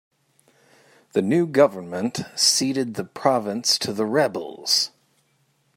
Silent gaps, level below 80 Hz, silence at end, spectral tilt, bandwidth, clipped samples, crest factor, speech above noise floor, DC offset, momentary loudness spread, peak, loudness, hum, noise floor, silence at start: none; -70 dBFS; 0.9 s; -3 dB/octave; 16 kHz; under 0.1%; 22 dB; 44 dB; under 0.1%; 10 LU; -2 dBFS; -21 LUFS; none; -66 dBFS; 1.15 s